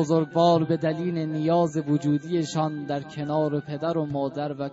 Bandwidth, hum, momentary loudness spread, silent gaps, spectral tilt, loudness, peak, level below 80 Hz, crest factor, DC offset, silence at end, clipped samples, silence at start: 8 kHz; none; 8 LU; none; -7 dB/octave; -25 LUFS; -8 dBFS; -66 dBFS; 16 dB; under 0.1%; 0 s; under 0.1%; 0 s